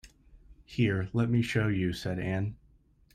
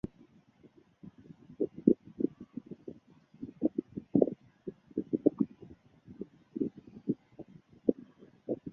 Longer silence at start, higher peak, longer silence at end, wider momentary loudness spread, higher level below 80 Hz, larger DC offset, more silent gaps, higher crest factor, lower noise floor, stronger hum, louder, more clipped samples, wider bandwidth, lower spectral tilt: second, 0.05 s vs 1.05 s; second, -14 dBFS vs -8 dBFS; first, 0.6 s vs 0 s; second, 7 LU vs 25 LU; first, -54 dBFS vs -68 dBFS; neither; neither; second, 16 dB vs 28 dB; about the same, -63 dBFS vs -62 dBFS; neither; first, -30 LUFS vs -34 LUFS; neither; first, 13.5 kHz vs 3.7 kHz; second, -7 dB/octave vs -11.5 dB/octave